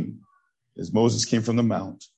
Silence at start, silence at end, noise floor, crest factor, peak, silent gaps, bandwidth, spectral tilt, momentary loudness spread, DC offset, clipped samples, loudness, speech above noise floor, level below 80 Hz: 0 s; 0.15 s; -67 dBFS; 18 dB; -8 dBFS; none; 9.2 kHz; -5.5 dB/octave; 12 LU; under 0.1%; under 0.1%; -23 LUFS; 43 dB; -58 dBFS